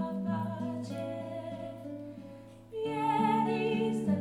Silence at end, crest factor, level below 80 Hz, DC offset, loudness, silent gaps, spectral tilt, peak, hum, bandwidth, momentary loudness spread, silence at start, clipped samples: 0 s; 16 dB; -66 dBFS; under 0.1%; -33 LUFS; none; -7.5 dB/octave; -16 dBFS; none; 12 kHz; 16 LU; 0 s; under 0.1%